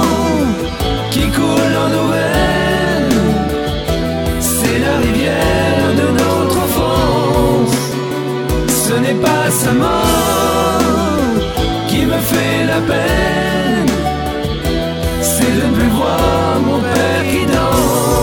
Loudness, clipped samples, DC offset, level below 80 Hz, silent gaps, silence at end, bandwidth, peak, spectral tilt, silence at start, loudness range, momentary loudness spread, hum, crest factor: -14 LUFS; under 0.1%; under 0.1%; -26 dBFS; none; 0 s; over 20 kHz; 0 dBFS; -5 dB/octave; 0 s; 1 LU; 5 LU; none; 14 dB